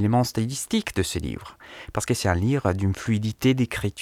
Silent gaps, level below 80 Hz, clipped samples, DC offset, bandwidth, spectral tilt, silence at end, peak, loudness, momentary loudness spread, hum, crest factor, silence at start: none; -44 dBFS; under 0.1%; under 0.1%; 16 kHz; -5.5 dB/octave; 0 s; -6 dBFS; -25 LUFS; 11 LU; none; 18 dB; 0 s